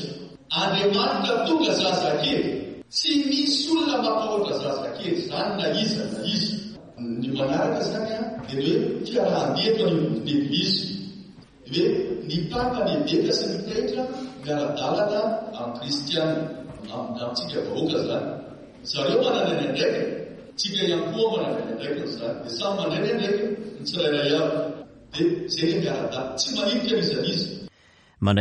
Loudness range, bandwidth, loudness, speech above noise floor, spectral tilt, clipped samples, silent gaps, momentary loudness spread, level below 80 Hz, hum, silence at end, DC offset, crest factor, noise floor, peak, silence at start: 4 LU; 11 kHz; -25 LUFS; 32 dB; -5 dB/octave; under 0.1%; none; 11 LU; -58 dBFS; none; 0 s; under 0.1%; 18 dB; -57 dBFS; -8 dBFS; 0 s